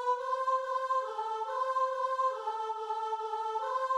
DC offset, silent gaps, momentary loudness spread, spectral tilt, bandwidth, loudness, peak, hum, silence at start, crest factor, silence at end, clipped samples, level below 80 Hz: under 0.1%; none; 5 LU; 0 dB/octave; 11.5 kHz; -33 LUFS; -20 dBFS; none; 0 s; 12 dB; 0 s; under 0.1%; -82 dBFS